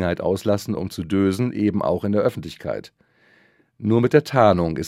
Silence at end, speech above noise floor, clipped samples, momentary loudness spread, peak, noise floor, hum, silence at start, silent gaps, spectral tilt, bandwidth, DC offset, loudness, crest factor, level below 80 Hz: 0 s; 38 dB; under 0.1%; 13 LU; 0 dBFS; -58 dBFS; none; 0 s; none; -7 dB/octave; 16 kHz; under 0.1%; -21 LUFS; 20 dB; -54 dBFS